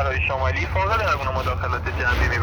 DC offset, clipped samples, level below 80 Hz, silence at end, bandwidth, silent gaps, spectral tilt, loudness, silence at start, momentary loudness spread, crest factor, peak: under 0.1%; under 0.1%; -28 dBFS; 0 s; over 20 kHz; none; -5.5 dB/octave; -22 LUFS; 0 s; 4 LU; 14 dB; -8 dBFS